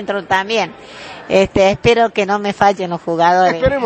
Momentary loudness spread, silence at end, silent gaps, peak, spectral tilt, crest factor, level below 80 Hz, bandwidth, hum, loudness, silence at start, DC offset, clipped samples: 11 LU; 0 s; none; 0 dBFS; -5 dB/octave; 14 dB; -38 dBFS; 8.8 kHz; none; -14 LUFS; 0 s; under 0.1%; under 0.1%